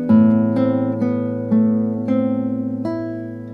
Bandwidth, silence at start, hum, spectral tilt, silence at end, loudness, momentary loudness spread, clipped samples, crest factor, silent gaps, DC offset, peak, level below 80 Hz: 4.5 kHz; 0 s; none; -11 dB/octave; 0 s; -19 LUFS; 10 LU; under 0.1%; 14 dB; none; under 0.1%; -4 dBFS; -58 dBFS